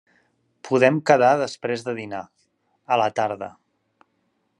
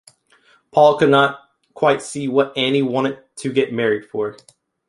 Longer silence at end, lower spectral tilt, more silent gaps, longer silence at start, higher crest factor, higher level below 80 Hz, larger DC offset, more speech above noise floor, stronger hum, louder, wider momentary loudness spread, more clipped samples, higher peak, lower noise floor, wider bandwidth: first, 1.1 s vs 0.55 s; about the same, -5.5 dB/octave vs -5 dB/octave; neither; about the same, 0.65 s vs 0.75 s; about the same, 22 dB vs 18 dB; second, -74 dBFS vs -64 dBFS; neither; first, 50 dB vs 39 dB; neither; second, -21 LUFS vs -18 LUFS; first, 17 LU vs 12 LU; neither; about the same, -2 dBFS vs -2 dBFS; first, -70 dBFS vs -56 dBFS; about the same, 11 kHz vs 11.5 kHz